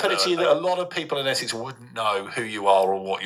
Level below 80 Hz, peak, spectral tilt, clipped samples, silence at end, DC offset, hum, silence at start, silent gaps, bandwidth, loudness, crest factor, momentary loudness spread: -72 dBFS; -6 dBFS; -3 dB/octave; under 0.1%; 0 s; under 0.1%; none; 0 s; none; 14 kHz; -23 LUFS; 18 dB; 9 LU